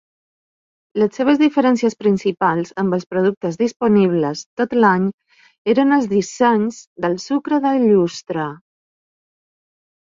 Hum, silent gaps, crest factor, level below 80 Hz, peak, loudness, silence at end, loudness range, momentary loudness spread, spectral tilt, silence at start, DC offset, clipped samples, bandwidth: none; 3.37-3.41 s, 3.76-3.80 s, 4.46-4.57 s, 5.14-5.18 s, 5.58-5.65 s, 6.87-6.96 s; 16 dB; -62 dBFS; -2 dBFS; -18 LUFS; 1.5 s; 2 LU; 10 LU; -6.5 dB/octave; 0.95 s; under 0.1%; under 0.1%; 7.6 kHz